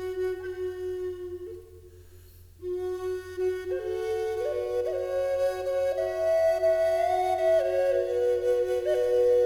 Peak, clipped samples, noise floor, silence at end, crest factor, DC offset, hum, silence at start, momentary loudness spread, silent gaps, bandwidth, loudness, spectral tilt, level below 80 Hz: -14 dBFS; under 0.1%; -50 dBFS; 0 s; 12 dB; under 0.1%; none; 0 s; 11 LU; none; 18.5 kHz; -27 LUFS; -5.5 dB/octave; -56 dBFS